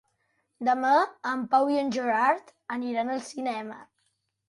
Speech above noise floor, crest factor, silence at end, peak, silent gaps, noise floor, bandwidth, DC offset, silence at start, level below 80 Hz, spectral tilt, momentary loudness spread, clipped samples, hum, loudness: 49 dB; 18 dB; 0.65 s; -10 dBFS; none; -75 dBFS; 11.5 kHz; under 0.1%; 0.6 s; -76 dBFS; -4 dB/octave; 12 LU; under 0.1%; none; -27 LUFS